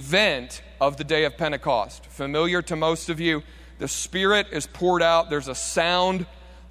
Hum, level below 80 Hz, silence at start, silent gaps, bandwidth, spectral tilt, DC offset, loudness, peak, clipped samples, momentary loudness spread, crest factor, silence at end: none; -46 dBFS; 0 s; none; 16 kHz; -3.5 dB/octave; under 0.1%; -23 LUFS; -6 dBFS; under 0.1%; 10 LU; 18 dB; 0 s